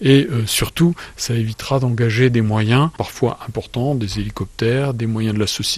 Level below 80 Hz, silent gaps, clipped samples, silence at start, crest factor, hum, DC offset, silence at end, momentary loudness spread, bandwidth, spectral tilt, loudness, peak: -40 dBFS; none; under 0.1%; 0 s; 16 dB; none; under 0.1%; 0 s; 8 LU; 14.5 kHz; -5.5 dB/octave; -19 LUFS; 0 dBFS